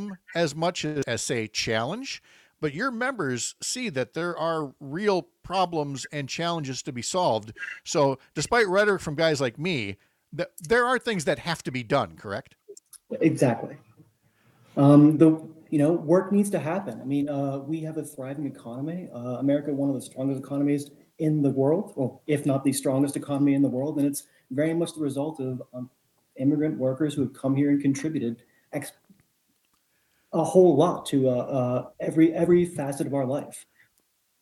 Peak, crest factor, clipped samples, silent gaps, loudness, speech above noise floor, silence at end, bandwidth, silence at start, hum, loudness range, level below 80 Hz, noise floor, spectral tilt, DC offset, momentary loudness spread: -6 dBFS; 20 dB; under 0.1%; none; -26 LUFS; 45 dB; 0.8 s; 13 kHz; 0 s; none; 7 LU; -64 dBFS; -70 dBFS; -5.5 dB/octave; under 0.1%; 13 LU